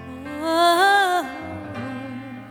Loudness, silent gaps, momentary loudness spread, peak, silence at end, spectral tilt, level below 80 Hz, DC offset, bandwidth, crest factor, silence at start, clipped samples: -18 LUFS; none; 18 LU; -6 dBFS; 0 s; -3.5 dB/octave; -58 dBFS; under 0.1%; 19 kHz; 16 dB; 0 s; under 0.1%